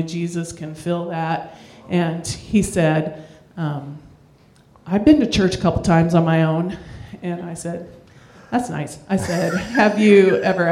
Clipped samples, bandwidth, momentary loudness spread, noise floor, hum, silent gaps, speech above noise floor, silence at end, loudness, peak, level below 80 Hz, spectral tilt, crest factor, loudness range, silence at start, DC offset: under 0.1%; 13 kHz; 16 LU; -51 dBFS; none; none; 33 dB; 0 s; -19 LUFS; 0 dBFS; -44 dBFS; -6.5 dB/octave; 18 dB; 5 LU; 0 s; under 0.1%